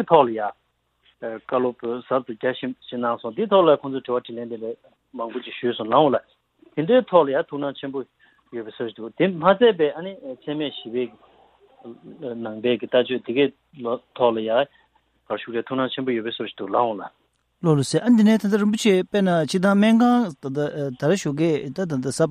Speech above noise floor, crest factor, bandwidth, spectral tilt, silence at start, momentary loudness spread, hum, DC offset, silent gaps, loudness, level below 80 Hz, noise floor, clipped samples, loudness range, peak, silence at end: 42 dB; 20 dB; 13 kHz; -6 dB/octave; 0 s; 16 LU; none; under 0.1%; none; -22 LUFS; -66 dBFS; -64 dBFS; under 0.1%; 7 LU; -2 dBFS; 0 s